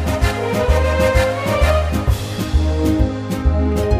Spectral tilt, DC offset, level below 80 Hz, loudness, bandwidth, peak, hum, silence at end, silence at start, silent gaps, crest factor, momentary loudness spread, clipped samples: -6.5 dB/octave; under 0.1%; -20 dBFS; -18 LUFS; 15.5 kHz; -2 dBFS; none; 0 s; 0 s; none; 14 dB; 5 LU; under 0.1%